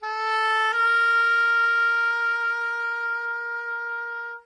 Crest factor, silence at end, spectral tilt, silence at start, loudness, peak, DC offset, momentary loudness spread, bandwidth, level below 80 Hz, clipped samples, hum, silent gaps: 10 dB; 0.05 s; 3.5 dB/octave; 0 s; -22 LUFS; -14 dBFS; under 0.1%; 10 LU; 10.5 kHz; under -90 dBFS; under 0.1%; none; none